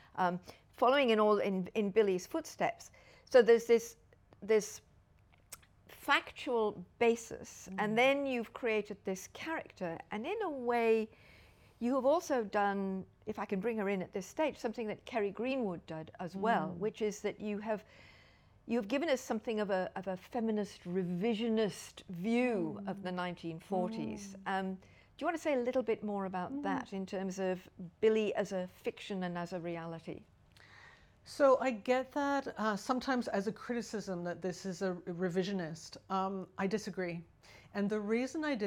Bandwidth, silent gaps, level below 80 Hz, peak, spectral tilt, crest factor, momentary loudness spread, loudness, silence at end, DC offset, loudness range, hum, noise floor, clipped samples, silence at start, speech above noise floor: 17 kHz; none; -70 dBFS; -14 dBFS; -5.5 dB/octave; 22 dB; 13 LU; -35 LUFS; 0 s; under 0.1%; 6 LU; none; -66 dBFS; under 0.1%; 0.15 s; 31 dB